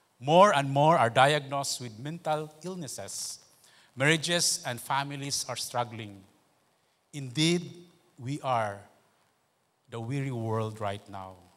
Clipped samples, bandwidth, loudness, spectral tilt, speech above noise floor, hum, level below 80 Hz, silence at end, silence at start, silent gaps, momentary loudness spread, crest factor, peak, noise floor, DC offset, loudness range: under 0.1%; 16 kHz; -28 LUFS; -4 dB/octave; 44 dB; none; -74 dBFS; 0.2 s; 0.2 s; none; 20 LU; 24 dB; -6 dBFS; -72 dBFS; under 0.1%; 8 LU